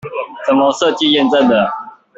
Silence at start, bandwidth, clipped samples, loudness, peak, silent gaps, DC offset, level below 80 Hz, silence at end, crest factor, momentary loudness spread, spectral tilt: 0.05 s; 8 kHz; under 0.1%; -13 LUFS; -2 dBFS; none; under 0.1%; -56 dBFS; 0.3 s; 12 dB; 11 LU; -4 dB/octave